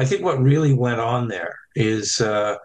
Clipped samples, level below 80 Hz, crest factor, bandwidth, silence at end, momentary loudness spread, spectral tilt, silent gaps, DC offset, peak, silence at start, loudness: under 0.1%; -54 dBFS; 14 dB; 9.4 kHz; 0 s; 9 LU; -5.5 dB/octave; none; under 0.1%; -6 dBFS; 0 s; -20 LUFS